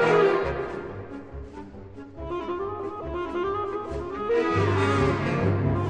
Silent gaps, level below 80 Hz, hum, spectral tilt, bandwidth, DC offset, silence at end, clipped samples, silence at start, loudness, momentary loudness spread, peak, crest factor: none; -44 dBFS; none; -7.5 dB/octave; 9.6 kHz; 0.2%; 0 s; under 0.1%; 0 s; -26 LUFS; 18 LU; -8 dBFS; 16 dB